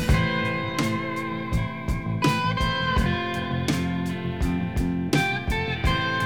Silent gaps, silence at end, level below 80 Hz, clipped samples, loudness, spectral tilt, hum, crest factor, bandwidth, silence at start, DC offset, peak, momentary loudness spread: none; 0 s; -34 dBFS; under 0.1%; -25 LUFS; -5.5 dB/octave; none; 16 dB; 19.5 kHz; 0 s; 0.4%; -8 dBFS; 5 LU